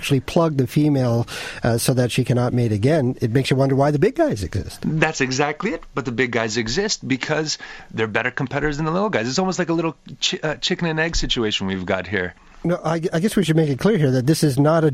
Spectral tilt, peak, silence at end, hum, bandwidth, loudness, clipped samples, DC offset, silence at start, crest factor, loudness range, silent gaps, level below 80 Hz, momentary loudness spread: -5.5 dB/octave; 0 dBFS; 0 s; none; 15.5 kHz; -20 LUFS; under 0.1%; under 0.1%; 0 s; 20 dB; 3 LU; none; -40 dBFS; 7 LU